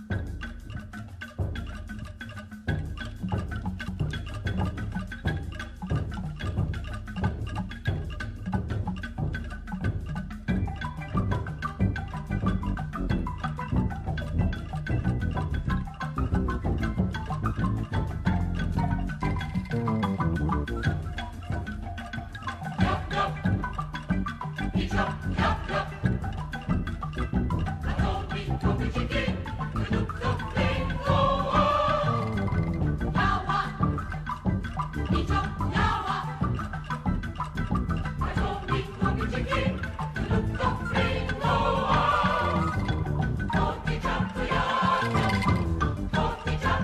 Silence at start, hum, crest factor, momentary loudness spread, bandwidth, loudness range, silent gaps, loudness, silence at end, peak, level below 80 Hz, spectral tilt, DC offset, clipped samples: 0 s; none; 18 dB; 10 LU; 12.5 kHz; 7 LU; none; -29 LUFS; 0 s; -10 dBFS; -36 dBFS; -7 dB/octave; under 0.1%; under 0.1%